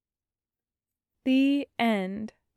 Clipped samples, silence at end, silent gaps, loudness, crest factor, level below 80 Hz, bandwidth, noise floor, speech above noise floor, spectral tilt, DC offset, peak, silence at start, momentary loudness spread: under 0.1%; 0.3 s; none; -27 LUFS; 16 dB; -70 dBFS; 12.5 kHz; under -90 dBFS; over 64 dB; -6.5 dB/octave; under 0.1%; -14 dBFS; 1.25 s; 11 LU